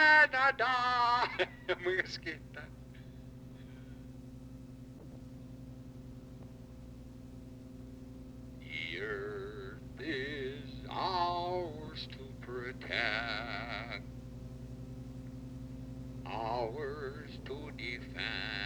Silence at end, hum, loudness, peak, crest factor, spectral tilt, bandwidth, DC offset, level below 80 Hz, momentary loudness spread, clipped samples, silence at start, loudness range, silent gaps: 0 s; 60 Hz at -60 dBFS; -35 LUFS; -14 dBFS; 24 dB; -5 dB/octave; over 20 kHz; under 0.1%; -54 dBFS; 21 LU; under 0.1%; 0 s; 15 LU; none